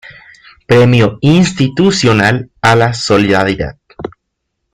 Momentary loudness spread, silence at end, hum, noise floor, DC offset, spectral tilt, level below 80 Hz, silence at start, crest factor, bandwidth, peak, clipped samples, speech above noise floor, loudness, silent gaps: 16 LU; 0.65 s; none; -71 dBFS; under 0.1%; -5.5 dB/octave; -40 dBFS; 0.1 s; 12 dB; 12 kHz; 0 dBFS; under 0.1%; 61 dB; -10 LUFS; none